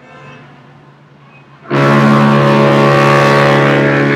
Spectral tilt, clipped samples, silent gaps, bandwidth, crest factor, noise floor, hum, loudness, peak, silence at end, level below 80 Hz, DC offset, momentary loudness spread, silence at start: -7 dB/octave; 0.5%; none; 11.5 kHz; 10 dB; -41 dBFS; none; -9 LUFS; 0 dBFS; 0 s; -50 dBFS; under 0.1%; 3 LU; 0.25 s